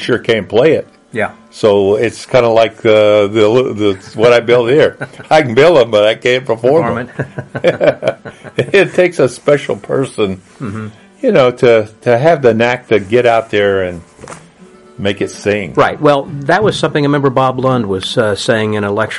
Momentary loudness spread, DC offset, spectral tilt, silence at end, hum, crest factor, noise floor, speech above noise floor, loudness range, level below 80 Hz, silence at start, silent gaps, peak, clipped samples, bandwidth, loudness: 11 LU; under 0.1%; -6 dB/octave; 0 s; none; 12 dB; -40 dBFS; 28 dB; 4 LU; -50 dBFS; 0 s; none; 0 dBFS; under 0.1%; 11.5 kHz; -12 LUFS